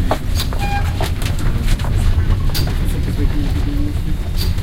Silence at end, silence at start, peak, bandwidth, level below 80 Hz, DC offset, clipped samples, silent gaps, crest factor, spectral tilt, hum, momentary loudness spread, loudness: 0 s; 0 s; -2 dBFS; 16.5 kHz; -18 dBFS; under 0.1%; under 0.1%; none; 14 dB; -5.5 dB/octave; none; 3 LU; -20 LUFS